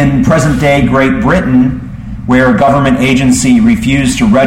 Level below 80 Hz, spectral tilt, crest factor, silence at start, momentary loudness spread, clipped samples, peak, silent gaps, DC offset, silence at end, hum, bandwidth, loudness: -26 dBFS; -6 dB/octave; 8 dB; 0 s; 4 LU; under 0.1%; 0 dBFS; none; under 0.1%; 0 s; none; 14 kHz; -9 LUFS